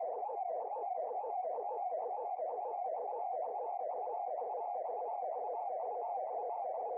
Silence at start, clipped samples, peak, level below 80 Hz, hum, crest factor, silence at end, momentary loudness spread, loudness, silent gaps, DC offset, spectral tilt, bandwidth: 0 s; under 0.1%; -30 dBFS; under -90 dBFS; none; 8 dB; 0 s; 1 LU; -39 LUFS; none; under 0.1%; 4 dB/octave; 2.8 kHz